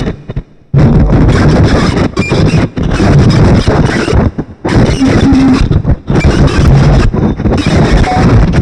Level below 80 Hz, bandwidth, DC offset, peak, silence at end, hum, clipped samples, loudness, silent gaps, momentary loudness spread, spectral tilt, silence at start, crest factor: -14 dBFS; 10.5 kHz; under 0.1%; 0 dBFS; 0 s; none; under 0.1%; -8 LUFS; none; 6 LU; -7 dB/octave; 0 s; 8 dB